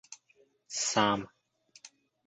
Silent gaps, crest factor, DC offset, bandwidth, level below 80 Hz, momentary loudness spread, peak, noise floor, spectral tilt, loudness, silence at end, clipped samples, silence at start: none; 24 dB; under 0.1%; 9 kHz; -70 dBFS; 24 LU; -10 dBFS; -68 dBFS; -2.5 dB/octave; -30 LUFS; 0.4 s; under 0.1%; 0.1 s